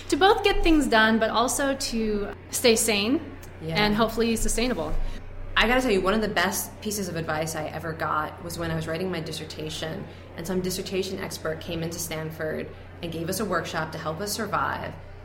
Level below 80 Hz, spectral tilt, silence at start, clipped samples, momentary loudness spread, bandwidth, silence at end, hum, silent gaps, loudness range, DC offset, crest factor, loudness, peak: -36 dBFS; -3.5 dB/octave; 0 s; under 0.1%; 13 LU; 16.5 kHz; 0 s; none; none; 8 LU; under 0.1%; 20 dB; -25 LUFS; -4 dBFS